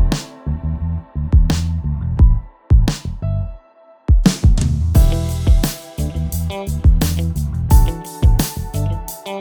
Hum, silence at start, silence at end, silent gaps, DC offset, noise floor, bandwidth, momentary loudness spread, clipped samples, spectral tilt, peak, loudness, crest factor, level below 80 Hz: none; 0 s; 0 s; none; under 0.1%; -48 dBFS; over 20 kHz; 9 LU; under 0.1%; -6 dB/octave; 0 dBFS; -18 LUFS; 16 dB; -18 dBFS